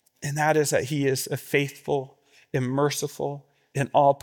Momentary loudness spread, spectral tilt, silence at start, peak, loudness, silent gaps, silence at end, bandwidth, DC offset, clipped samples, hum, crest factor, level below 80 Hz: 11 LU; -5 dB/octave; 0.2 s; -6 dBFS; -26 LUFS; none; 0.05 s; 18 kHz; under 0.1%; under 0.1%; none; 20 dB; -68 dBFS